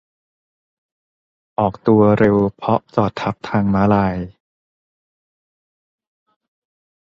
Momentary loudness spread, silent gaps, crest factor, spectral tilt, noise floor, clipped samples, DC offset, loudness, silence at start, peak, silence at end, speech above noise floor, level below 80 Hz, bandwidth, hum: 11 LU; none; 18 dB; -9 dB/octave; under -90 dBFS; under 0.1%; under 0.1%; -17 LUFS; 1.6 s; -2 dBFS; 2.8 s; over 74 dB; -46 dBFS; 6.8 kHz; none